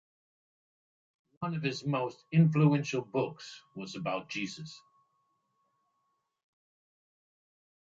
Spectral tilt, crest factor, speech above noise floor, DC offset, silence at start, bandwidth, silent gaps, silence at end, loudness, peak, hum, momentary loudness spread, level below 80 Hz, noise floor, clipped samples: -7 dB/octave; 22 dB; 49 dB; under 0.1%; 1.4 s; 7.6 kHz; none; 3.05 s; -31 LUFS; -14 dBFS; none; 19 LU; -76 dBFS; -80 dBFS; under 0.1%